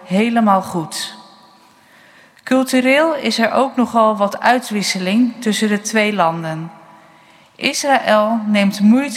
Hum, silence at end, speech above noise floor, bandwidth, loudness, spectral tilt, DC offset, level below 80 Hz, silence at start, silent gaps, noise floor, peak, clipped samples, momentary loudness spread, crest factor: none; 0 s; 33 dB; 16 kHz; -16 LUFS; -4.5 dB/octave; under 0.1%; -68 dBFS; 0 s; none; -48 dBFS; 0 dBFS; under 0.1%; 11 LU; 16 dB